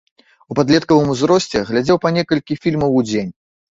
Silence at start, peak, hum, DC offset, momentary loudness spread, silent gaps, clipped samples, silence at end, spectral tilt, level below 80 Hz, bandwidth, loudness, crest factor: 0.5 s; -2 dBFS; none; under 0.1%; 8 LU; none; under 0.1%; 0.45 s; -6 dB/octave; -48 dBFS; 8 kHz; -16 LUFS; 16 dB